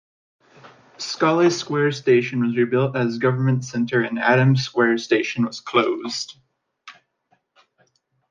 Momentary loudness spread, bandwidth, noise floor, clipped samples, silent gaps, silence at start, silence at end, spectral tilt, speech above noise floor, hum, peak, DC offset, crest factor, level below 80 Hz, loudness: 8 LU; 9.4 kHz; -67 dBFS; under 0.1%; none; 0.65 s; 1.4 s; -6 dB/octave; 47 dB; none; -2 dBFS; under 0.1%; 18 dB; -66 dBFS; -20 LUFS